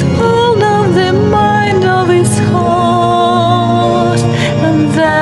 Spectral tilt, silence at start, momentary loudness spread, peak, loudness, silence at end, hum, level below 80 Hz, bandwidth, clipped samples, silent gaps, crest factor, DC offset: -6 dB/octave; 0 s; 2 LU; 0 dBFS; -10 LUFS; 0 s; none; -36 dBFS; 12 kHz; under 0.1%; none; 10 dB; under 0.1%